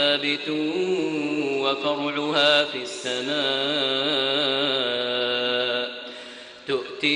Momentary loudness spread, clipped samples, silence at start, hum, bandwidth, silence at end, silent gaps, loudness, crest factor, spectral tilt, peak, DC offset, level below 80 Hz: 9 LU; under 0.1%; 0 s; none; 11 kHz; 0 s; none; -23 LUFS; 18 dB; -3.5 dB/octave; -6 dBFS; under 0.1%; -68 dBFS